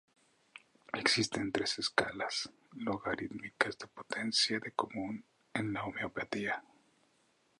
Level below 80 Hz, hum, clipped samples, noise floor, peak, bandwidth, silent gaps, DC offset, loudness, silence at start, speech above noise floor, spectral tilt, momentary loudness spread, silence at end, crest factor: -70 dBFS; none; under 0.1%; -73 dBFS; -10 dBFS; 11.5 kHz; none; under 0.1%; -35 LUFS; 0.55 s; 36 dB; -3 dB/octave; 12 LU; 1 s; 28 dB